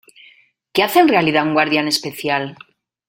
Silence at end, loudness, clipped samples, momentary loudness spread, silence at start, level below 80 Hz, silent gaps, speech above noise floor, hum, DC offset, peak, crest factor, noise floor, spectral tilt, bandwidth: 0.55 s; -16 LUFS; under 0.1%; 9 LU; 0.75 s; -60 dBFS; none; 36 dB; none; under 0.1%; -2 dBFS; 16 dB; -52 dBFS; -4 dB/octave; 16.5 kHz